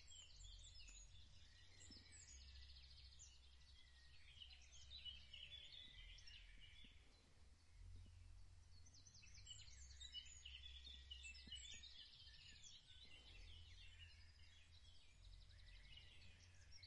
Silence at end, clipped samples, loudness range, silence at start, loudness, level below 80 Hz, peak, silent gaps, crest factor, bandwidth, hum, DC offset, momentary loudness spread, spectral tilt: 0 s; under 0.1%; 7 LU; 0 s; -62 LUFS; -68 dBFS; -46 dBFS; none; 18 dB; 10.5 kHz; none; under 0.1%; 12 LU; -1.5 dB/octave